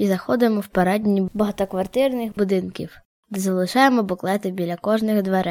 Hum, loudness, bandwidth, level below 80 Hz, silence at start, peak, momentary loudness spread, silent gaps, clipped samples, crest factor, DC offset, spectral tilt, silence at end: none; -21 LUFS; 16.5 kHz; -54 dBFS; 0 s; -2 dBFS; 9 LU; 3.05-3.23 s; under 0.1%; 18 dB; under 0.1%; -6 dB/octave; 0 s